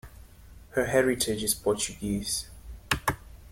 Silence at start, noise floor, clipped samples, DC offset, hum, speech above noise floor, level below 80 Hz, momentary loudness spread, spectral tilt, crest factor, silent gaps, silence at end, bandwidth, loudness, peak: 0.05 s; -50 dBFS; under 0.1%; under 0.1%; none; 22 dB; -46 dBFS; 11 LU; -3.5 dB/octave; 22 dB; none; 0.05 s; 16.5 kHz; -28 LUFS; -8 dBFS